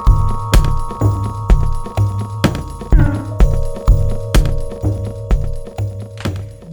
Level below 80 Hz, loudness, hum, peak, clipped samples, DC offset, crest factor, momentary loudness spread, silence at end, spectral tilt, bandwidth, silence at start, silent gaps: -16 dBFS; -18 LUFS; none; 0 dBFS; under 0.1%; under 0.1%; 14 dB; 9 LU; 0 s; -6.5 dB/octave; 19.5 kHz; 0 s; none